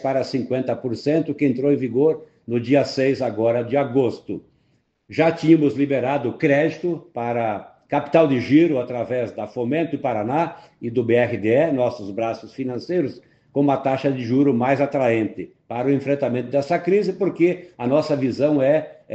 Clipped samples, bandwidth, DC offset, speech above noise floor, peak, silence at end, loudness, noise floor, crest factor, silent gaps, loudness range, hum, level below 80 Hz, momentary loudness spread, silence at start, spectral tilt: under 0.1%; 8 kHz; under 0.1%; 45 dB; -2 dBFS; 0 s; -21 LUFS; -65 dBFS; 18 dB; none; 2 LU; none; -62 dBFS; 10 LU; 0 s; -8 dB/octave